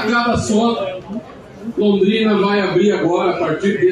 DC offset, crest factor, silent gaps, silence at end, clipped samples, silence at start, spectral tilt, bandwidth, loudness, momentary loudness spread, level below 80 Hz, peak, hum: under 0.1%; 12 dB; none; 0 s; under 0.1%; 0 s; -5.5 dB/octave; 10.5 kHz; -16 LUFS; 13 LU; -46 dBFS; -4 dBFS; none